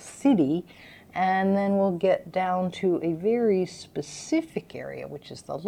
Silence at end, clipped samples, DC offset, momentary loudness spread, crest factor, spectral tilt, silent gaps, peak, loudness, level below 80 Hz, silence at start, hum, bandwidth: 0 s; under 0.1%; under 0.1%; 14 LU; 16 dB; -6.5 dB/octave; none; -10 dBFS; -26 LUFS; -64 dBFS; 0 s; none; 12 kHz